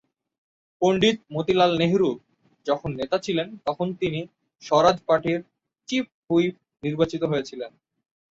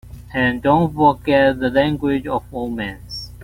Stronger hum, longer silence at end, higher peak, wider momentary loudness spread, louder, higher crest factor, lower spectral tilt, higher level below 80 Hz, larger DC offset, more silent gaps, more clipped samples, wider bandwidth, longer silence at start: second, none vs 60 Hz at -35 dBFS; first, 0.7 s vs 0 s; about the same, -4 dBFS vs -2 dBFS; about the same, 14 LU vs 12 LU; second, -24 LUFS vs -18 LUFS; about the same, 20 dB vs 18 dB; about the same, -6 dB/octave vs -7 dB/octave; second, -58 dBFS vs -40 dBFS; neither; first, 6.14-6.23 s vs none; neither; second, 7.8 kHz vs 16.5 kHz; first, 0.8 s vs 0.05 s